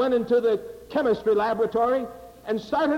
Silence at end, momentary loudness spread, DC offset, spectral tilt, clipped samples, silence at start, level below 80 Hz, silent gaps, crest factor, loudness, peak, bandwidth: 0 s; 9 LU; under 0.1%; -6.5 dB/octave; under 0.1%; 0 s; -56 dBFS; none; 10 dB; -24 LUFS; -14 dBFS; 16 kHz